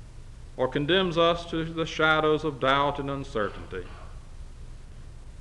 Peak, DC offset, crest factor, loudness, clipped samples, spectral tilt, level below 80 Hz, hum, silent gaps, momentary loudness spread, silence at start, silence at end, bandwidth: -8 dBFS; under 0.1%; 20 dB; -26 LUFS; under 0.1%; -5.5 dB/octave; -44 dBFS; none; none; 24 LU; 0 s; 0 s; 11 kHz